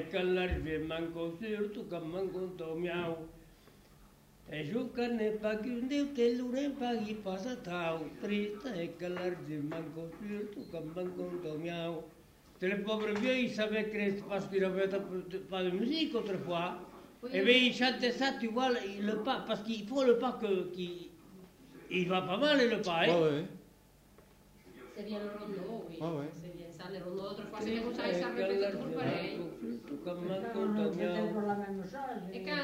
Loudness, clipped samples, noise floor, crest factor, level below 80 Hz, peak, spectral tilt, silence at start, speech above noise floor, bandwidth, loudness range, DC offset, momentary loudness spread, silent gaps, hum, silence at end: -35 LUFS; under 0.1%; -62 dBFS; 22 dB; -60 dBFS; -14 dBFS; -5.5 dB/octave; 0 s; 27 dB; 16 kHz; 9 LU; under 0.1%; 12 LU; none; none; 0 s